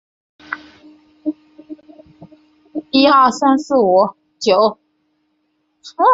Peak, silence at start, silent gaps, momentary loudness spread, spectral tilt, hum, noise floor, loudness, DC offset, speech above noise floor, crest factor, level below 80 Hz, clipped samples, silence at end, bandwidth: -2 dBFS; 0.5 s; none; 26 LU; -4.5 dB/octave; none; -66 dBFS; -15 LUFS; under 0.1%; 53 dB; 16 dB; -62 dBFS; under 0.1%; 0 s; 8 kHz